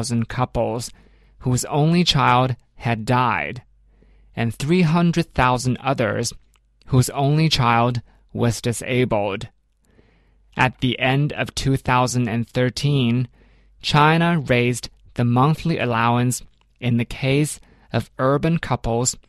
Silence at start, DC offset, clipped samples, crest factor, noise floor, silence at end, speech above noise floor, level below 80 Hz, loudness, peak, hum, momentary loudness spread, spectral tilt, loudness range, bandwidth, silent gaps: 0 s; under 0.1%; under 0.1%; 18 dB; -57 dBFS; 0.1 s; 38 dB; -42 dBFS; -20 LUFS; -2 dBFS; none; 11 LU; -5.5 dB/octave; 3 LU; 13.5 kHz; none